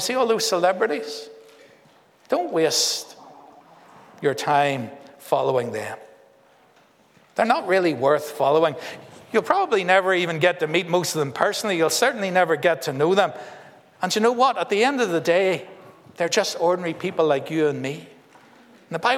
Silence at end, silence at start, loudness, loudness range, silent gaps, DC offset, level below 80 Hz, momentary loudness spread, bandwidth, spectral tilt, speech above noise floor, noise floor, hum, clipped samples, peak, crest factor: 0 s; 0 s; -21 LUFS; 5 LU; none; under 0.1%; -78 dBFS; 12 LU; 17 kHz; -3.5 dB/octave; 35 dB; -57 dBFS; none; under 0.1%; -2 dBFS; 20 dB